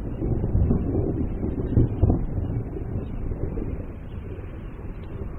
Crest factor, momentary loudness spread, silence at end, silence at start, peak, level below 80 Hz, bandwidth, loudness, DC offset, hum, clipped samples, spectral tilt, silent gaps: 18 dB; 13 LU; 0 s; 0 s; -6 dBFS; -30 dBFS; 3.3 kHz; -27 LUFS; under 0.1%; none; under 0.1%; -12 dB/octave; none